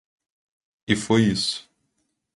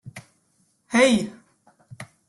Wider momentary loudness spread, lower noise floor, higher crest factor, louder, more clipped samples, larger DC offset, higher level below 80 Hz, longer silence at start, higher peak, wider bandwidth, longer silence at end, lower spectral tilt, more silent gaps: second, 15 LU vs 25 LU; first, -74 dBFS vs -66 dBFS; about the same, 22 dB vs 20 dB; about the same, -22 LUFS vs -20 LUFS; neither; neither; first, -54 dBFS vs -60 dBFS; first, 0.9 s vs 0.05 s; about the same, -4 dBFS vs -6 dBFS; about the same, 11.5 kHz vs 12.5 kHz; first, 0.75 s vs 0.25 s; about the same, -4.5 dB/octave vs -4 dB/octave; neither